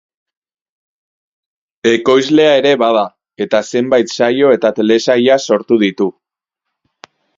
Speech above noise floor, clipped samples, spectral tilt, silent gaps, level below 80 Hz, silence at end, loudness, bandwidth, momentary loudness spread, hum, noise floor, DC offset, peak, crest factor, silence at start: 67 dB; under 0.1%; -4.5 dB/octave; none; -60 dBFS; 1.25 s; -12 LUFS; 7.8 kHz; 7 LU; none; -79 dBFS; under 0.1%; 0 dBFS; 14 dB; 1.85 s